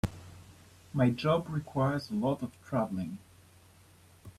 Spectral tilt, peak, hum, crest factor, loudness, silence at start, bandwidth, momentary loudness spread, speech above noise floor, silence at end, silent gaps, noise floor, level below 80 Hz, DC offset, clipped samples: -7.5 dB/octave; -14 dBFS; none; 20 dB; -32 LUFS; 0.05 s; 14 kHz; 14 LU; 28 dB; 0.05 s; none; -59 dBFS; -58 dBFS; under 0.1%; under 0.1%